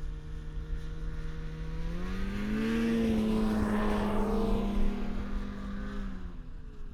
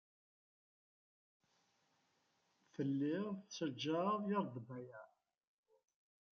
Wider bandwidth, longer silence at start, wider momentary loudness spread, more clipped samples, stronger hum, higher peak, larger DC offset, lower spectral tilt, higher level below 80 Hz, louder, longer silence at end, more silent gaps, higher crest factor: first, 13 kHz vs 6.8 kHz; second, 0 s vs 2.8 s; about the same, 14 LU vs 16 LU; neither; neither; first, -18 dBFS vs -26 dBFS; neither; first, -7 dB/octave vs -5.5 dB/octave; first, -36 dBFS vs -90 dBFS; first, -33 LUFS vs -41 LUFS; second, 0 s vs 1.25 s; neither; second, 14 dB vs 20 dB